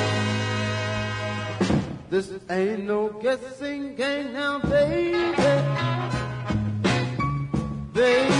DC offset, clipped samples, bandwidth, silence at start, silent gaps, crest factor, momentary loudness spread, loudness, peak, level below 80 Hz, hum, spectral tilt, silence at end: under 0.1%; under 0.1%; 10.5 kHz; 0 s; none; 16 dB; 8 LU; -25 LUFS; -8 dBFS; -46 dBFS; none; -6 dB/octave; 0 s